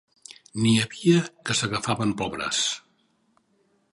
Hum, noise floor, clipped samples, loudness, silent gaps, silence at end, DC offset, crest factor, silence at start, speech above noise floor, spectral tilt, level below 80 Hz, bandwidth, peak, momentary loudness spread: none; -67 dBFS; under 0.1%; -24 LUFS; none; 1.15 s; under 0.1%; 20 dB; 0.3 s; 43 dB; -4 dB/octave; -58 dBFS; 11.5 kHz; -6 dBFS; 10 LU